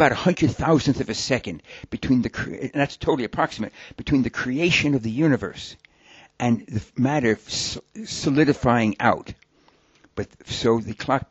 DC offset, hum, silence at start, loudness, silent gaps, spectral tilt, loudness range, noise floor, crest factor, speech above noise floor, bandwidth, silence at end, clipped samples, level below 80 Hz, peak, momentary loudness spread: under 0.1%; none; 0 s; -23 LUFS; none; -5.5 dB/octave; 2 LU; -59 dBFS; 20 dB; 37 dB; 8.2 kHz; 0.05 s; under 0.1%; -46 dBFS; -4 dBFS; 14 LU